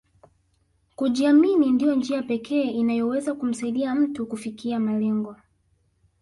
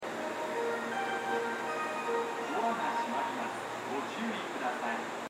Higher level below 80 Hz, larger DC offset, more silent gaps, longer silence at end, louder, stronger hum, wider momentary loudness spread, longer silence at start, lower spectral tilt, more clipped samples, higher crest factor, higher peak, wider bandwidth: first, -64 dBFS vs -80 dBFS; neither; neither; first, 0.85 s vs 0 s; first, -23 LUFS vs -34 LUFS; neither; first, 11 LU vs 4 LU; first, 1 s vs 0 s; first, -6 dB/octave vs -3.5 dB/octave; neither; about the same, 14 dB vs 16 dB; first, -8 dBFS vs -20 dBFS; second, 11.5 kHz vs 16 kHz